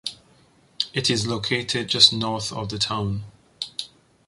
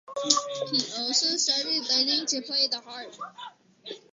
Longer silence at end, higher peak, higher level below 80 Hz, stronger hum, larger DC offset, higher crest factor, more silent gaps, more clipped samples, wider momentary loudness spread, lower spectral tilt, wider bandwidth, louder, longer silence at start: first, 0.4 s vs 0.15 s; about the same, -2 dBFS vs -4 dBFS; first, -52 dBFS vs -78 dBFS; neither; neither; about the same, 24 dB vs 26 dB; neither; neither; about the same, 19 LU vs 19 LU; first, -3 dB/octave vs -0.5 dB/octave; first, 11.5 kHz vs 8 kHz; first, -21 LUFS vs -24 LUFS; about the same, 0.05 s vs 0.1 s